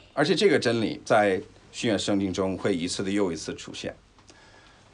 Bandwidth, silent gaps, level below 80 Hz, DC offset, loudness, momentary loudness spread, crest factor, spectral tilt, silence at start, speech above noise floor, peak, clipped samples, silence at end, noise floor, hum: 11 kHz; none; -60 dBFS; under 0.1%; -26 LUFS; 14 LU; 18 dB; -4.5 dB/octave; 0.15 s; 28 dB; -8 dBFS; under 0.1%; 1 s; -54 dBFS; none